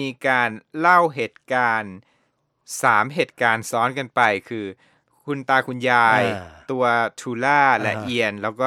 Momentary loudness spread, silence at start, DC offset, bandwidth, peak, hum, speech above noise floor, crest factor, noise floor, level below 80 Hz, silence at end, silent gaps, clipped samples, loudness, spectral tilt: 14 LU; 0 s; under 0.1%; 16.5 kHz; -2 dBFS; none; 48 dB; 20 dB; -68 dBFS; -66 dBFS; 0 s; none; under 0.1%; -20 LUFS; -4.5 dB/octave